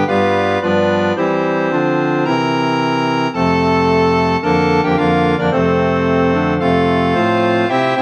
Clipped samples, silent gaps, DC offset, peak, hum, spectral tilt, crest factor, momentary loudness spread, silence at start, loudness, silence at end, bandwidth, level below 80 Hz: under 0.1%; none; under 0.1%; -2 dBFS; none; -7 dB/octave; 12 dB; 2 LU; 0 s; -15 LUFS; 0 s; 8.8 kHz; -42 dBFS